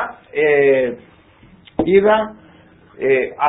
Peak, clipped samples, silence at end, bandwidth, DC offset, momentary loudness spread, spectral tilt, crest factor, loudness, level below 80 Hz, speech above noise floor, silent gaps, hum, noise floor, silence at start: 0 dBFS; under 0.1%; 0 s; 4 kHz; under 0.1%; 14 LU; -11 dB/octave; 16 dB; -16 LUFS; -50 dBFS; 32 dB; none; none; -48 dBFS; 0 s